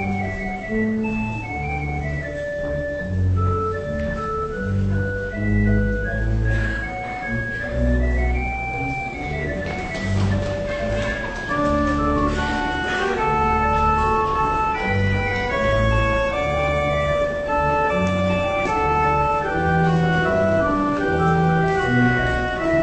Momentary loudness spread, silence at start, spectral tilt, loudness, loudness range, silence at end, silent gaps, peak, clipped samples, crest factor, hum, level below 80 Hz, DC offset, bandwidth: 7 LU; 0 s; -7 dB/octave; -21 LUFS; 5 LU; 0 s; none; -6 dBFS; under 0.1%; 14 dB; none; -30 dBFS; under 0.1%; 8.6 kHz